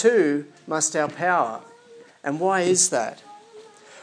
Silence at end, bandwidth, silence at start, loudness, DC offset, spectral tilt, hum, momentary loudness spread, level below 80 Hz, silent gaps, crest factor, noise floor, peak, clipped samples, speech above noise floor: 0 s; 10.5 kHz; 0 s; -22 LUFS; under 0.1%; -3 dB/octave; none; 13 LU; -84 dBFS; none; 18 dB; -49 dBFS; -6 dBFS; under 0.1%; 27 dB